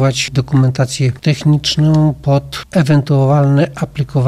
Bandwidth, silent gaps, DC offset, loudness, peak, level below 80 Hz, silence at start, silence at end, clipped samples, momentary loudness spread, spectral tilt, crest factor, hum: 12.5 kHz; none; under 0.1%; -13 LUFS; -2 dBFS; -40 dBFS; 0 s; 0 s; under 0.1%; 5 LU; -6.5 dB/octave; 10 dB; none